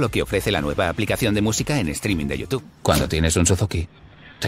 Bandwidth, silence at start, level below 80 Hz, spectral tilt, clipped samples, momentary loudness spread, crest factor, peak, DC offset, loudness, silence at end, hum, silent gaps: 16 kHz; 0 s; -34 dBFS; -4.5 dB/octave; under 0.1%; 7 LU; 20 dB; -2 dBFS; under 0.1%; -21 LUFS; 0 s; none; none